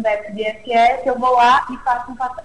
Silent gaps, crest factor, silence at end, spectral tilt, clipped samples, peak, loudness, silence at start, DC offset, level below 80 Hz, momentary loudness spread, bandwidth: none; 12 dB; 0.05 s; -4 dB/octave; under 0.1%; -6 dBFS; -17 LUFS; 0 s; 0.7%; -48 dBFS; 12 LU; 11 kHz